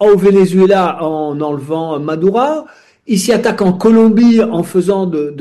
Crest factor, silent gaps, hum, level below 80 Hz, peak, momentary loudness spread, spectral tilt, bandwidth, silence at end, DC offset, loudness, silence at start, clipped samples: 10 dB; none; none; -48 dBFS; -2 dBFS; 10 LU; -6.5 dB/octave; 12.5 kHz; 0 s; under 0.1%; -12 LUFS; 0 s; under 0.1%